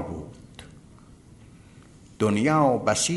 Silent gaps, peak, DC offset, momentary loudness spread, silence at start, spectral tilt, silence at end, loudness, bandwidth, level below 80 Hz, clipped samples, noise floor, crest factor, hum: none; -8 dBFS; under 0.1%; 25 LU; 0 s; -4.5 dB/octave; 0 s; -23 LUFS; 11.5 kHz; -54 dBFS; under 0.1%; -50 dBFS; 18 dB; none